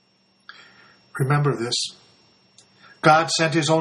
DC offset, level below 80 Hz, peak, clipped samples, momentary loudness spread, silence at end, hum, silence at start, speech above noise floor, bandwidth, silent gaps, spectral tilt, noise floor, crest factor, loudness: under 0.1%; -64 dBFS; 0 dBFS; under 0.1%; 11 LU; 0 s; none; 1.15 s; 38 dB; 11.5 kHz; none; -4.5 dB/octave; -57 dBFS; 22 dB; -20 LUFS